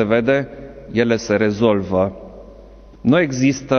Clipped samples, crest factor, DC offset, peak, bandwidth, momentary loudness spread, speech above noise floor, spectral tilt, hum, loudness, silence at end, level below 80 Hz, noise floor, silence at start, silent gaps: under 0.1%; 16 dB; under 0.1%; -2 dBFS; 6.8 kHz; 16 LU; 25 dB; -6 dB/octave; none; -18 LUFS; 0 s; -44 dBFS; -41 dBFS; 0 s; none